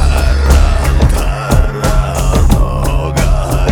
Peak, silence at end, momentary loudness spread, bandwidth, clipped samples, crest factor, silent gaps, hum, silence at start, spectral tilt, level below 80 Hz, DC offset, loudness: 0 dBFS; 0 s; 4 LU; 18.5 kHz; 0.2%; 10 dB; none; none; 0 s; -6 dB/octave; -12 dBFS; under 0.1%; -13 LUFS